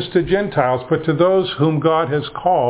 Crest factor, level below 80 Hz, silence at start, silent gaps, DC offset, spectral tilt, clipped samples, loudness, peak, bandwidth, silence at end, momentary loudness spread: 16 dB; -46 dBFS; 0 s; none; under 0.1%; -11 dB/octave; under 0.1%; -17 LUFS; -2 dBFS; 4 kHz; 0 s; 4 LU